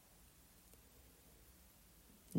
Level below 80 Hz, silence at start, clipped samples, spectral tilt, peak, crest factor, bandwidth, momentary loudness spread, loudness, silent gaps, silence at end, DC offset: -70 dBFS; 0 s; under 0.1%; -6 dB/octave; -28 dBFS; 26 dB; 16 kHz; 1 LU; -65 LUFS; none; 0 s; under 0.1%